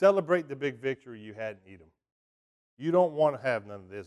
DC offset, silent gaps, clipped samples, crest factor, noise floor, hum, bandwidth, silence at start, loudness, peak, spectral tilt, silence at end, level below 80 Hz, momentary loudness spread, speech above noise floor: under 0.1%; 2.12-2.77 s; under 0.1%; 20 dB; under -90 dBFS; none; 11.5 kHz; 0 s; -29 LUFS; -10 dBFS; -7 dB/octave; 0.05 s; -72 dBFS; 16 LU; over 61 dB